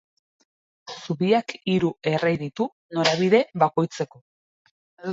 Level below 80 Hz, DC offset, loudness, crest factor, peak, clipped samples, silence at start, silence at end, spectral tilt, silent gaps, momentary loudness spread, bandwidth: -64 dBFS; under 0.1%; -23 LUFS; 20 dB; -4 dBFS; under 0.1%; 0.85 s; 0 s; -5.5 dB/octave; 2.72-2.89 s, 4.21-4.65 s, 4.71-4.97 s; 13 LU; 7.8 kHz